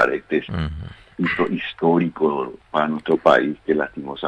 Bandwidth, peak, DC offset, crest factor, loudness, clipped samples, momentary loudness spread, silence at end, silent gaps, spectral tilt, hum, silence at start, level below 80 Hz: 9.6 kHz; -2 dBFS; under 0.1%; 18 dB; -21 LUFS; under 0.1%; 11 LU; 0 s; none; -7.5 dB/octave; none; 0 s; -42 dBFS